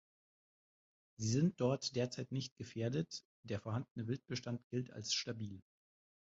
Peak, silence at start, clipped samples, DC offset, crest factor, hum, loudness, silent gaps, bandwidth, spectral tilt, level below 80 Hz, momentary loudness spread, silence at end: -22 dBFS; 1.2 s; under 0.1%; under 0.1%; 20 dB; none; -41 LUFS; 2.51-2.56 s, 3.25-3.43 s, 3.91-3.95 s, 4.64-4.70 s; 7.6 kHz; -5.5 dB/octave; -72 dBFS; 11 LU; 0.7 s